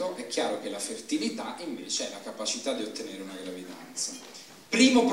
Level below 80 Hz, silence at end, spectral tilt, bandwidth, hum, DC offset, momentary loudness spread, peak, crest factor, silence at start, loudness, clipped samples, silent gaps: -72 dBFS; 0 s; -2.5 dB/octave; 16 kHz; none; under 0.1%; 14 LU; -8 dBFS; 22 dB; 0 s; -30 LUFS; under 0.1%; none